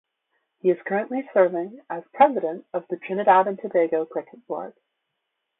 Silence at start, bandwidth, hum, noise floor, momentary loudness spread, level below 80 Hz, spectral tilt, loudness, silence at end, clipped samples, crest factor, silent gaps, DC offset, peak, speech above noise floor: 0.65 s; 4 kHz; none; -79 dBFS; 15 LU; -76 dBFS; -10.5 dB/octave; -23 LUFS; 0.9 s; under 0.1%; 20 dB; none; under 0.1%; -4 dBFS; 56 dB